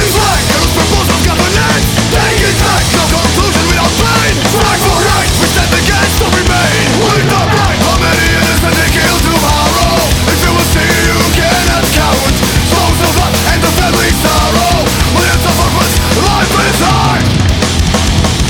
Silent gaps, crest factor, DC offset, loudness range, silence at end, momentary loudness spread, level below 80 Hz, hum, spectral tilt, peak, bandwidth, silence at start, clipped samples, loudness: none; 10 dB; under 0.1%; 0 LU; 0 s; 1 LU; -18 dBFS; none; -4 dB/octave; 0 dBFS; 19.5 kHz; 0 s; under 0.1%; -9 LUFS